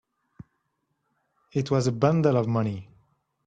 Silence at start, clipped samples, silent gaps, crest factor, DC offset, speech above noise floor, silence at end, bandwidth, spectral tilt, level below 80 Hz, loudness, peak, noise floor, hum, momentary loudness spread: 0.4 s; under 0.1%; none; 20 dB; under 0.1%; 53 dB; 0.65 s; 9.4 kHz; -7.5 dB/octave; -62 dBFS; -25 LUFS; -8 dBFS; -76 dBFS; none; 10 LU